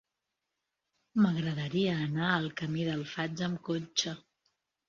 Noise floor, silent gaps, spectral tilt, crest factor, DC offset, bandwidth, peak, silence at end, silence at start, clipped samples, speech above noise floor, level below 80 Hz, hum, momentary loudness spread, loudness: -86 dBFS; none; -5 dB/octave; 20 dB; under 0.1%; 7.4 kHz; -12 dBFS; 0.7 s; 1.15 s; under 0.1%; 55 dB; -68 dBFS; none; 7 LU; -32 LUFS